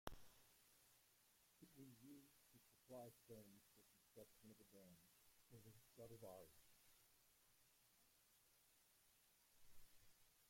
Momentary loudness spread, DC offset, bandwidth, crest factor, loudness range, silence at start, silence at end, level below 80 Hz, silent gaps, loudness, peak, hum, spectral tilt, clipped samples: 7 LU; under 0.1%; 16.5 kHz; 36 dB; 2 LU; 0.05 s; 0 s; -80 dBFS; none; -65 LUFS; -30 dBFS; none; -4.5 dB/octave; under 0.1%